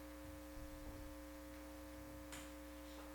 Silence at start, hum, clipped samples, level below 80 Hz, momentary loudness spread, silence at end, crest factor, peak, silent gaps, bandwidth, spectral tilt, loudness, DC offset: 0 s; 60 Hz at -60 dBFS; under 0.1%; -58 dBFS; 2 LU; 0 s; 14 dB; -40 dBFS; none; 19 kHz; -4.5 dB/octave; -54 LUFS; under 0.1%